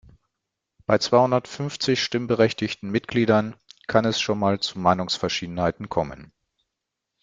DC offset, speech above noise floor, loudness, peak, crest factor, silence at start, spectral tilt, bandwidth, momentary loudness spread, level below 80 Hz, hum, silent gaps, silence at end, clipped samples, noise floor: under 0.1%; 61 dB; -23 LUFS; -2 dBFS; 22 dB; 0.9 s; -5 dB/octave; 9.4 kHz; 9 LU; -56 dBFS; none; none; 1 s; under 0.1%; -83 dBFS